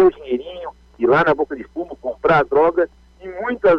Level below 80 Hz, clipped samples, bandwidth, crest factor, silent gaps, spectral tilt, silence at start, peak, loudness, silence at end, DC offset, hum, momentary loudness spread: -48 dBFS; under 0.1%; 6.2 kHz; 12 dB; none; -8 dB/octave; 0 s; -6 dBFS; -19 LUFS; 0 s; under 0.1%; none; 18 LU